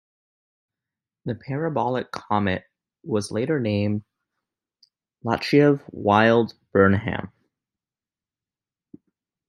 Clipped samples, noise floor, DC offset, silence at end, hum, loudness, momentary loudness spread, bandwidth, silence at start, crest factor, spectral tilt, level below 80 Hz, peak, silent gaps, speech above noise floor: under 0.1%; under -90 dBFS; under 0.1%; 2.2 s; none; -22 LUFS; 15 LU; 12 kHz; 1.25 s; 22 dB; -7 dB/octave; -62 dBFS; -2 dBFS; none; over 69 dB